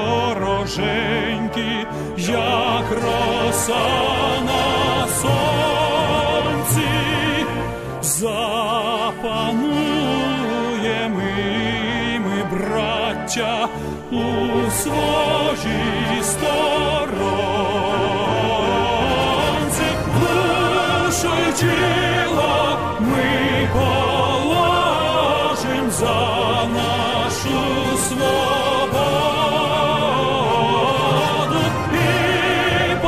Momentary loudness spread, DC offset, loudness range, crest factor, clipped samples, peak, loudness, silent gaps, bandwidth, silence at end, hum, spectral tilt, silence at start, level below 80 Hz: 4 LU; 0.6%; 3 LU; 14 dB; under 0.1%; -6 dBFS; -19 LUFS; none; 15.5 kHz; 0 s; none; -4 dB/octave; 0 s; -40 dBFS